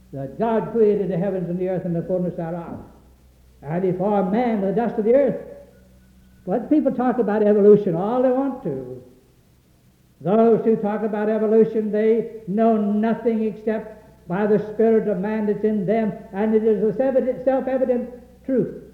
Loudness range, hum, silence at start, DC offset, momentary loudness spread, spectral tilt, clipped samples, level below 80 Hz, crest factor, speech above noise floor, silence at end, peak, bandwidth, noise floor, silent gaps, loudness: 4 LU; none; 0.1 s; under 0.1%; 12 LU; -10 dB/octave; under 0.1%; -54 dBFS; 18 dB; 36 dB; 0.05 s; -4 dBFS; 4.4 kHz; -56 dBFS; none; -21 LUFS